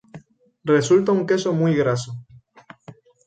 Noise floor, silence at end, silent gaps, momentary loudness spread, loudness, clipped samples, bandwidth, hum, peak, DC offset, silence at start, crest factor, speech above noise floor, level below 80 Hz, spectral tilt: -48 dBFS; 0.35 s; none; 15 LU; -20 LUFS; under 0.1%; 9.2 kHz; none; -4 dBFS; under 0.1%; 0.15 s; 16 dB; 30 dB; -60 dBFS; -6 dB/octave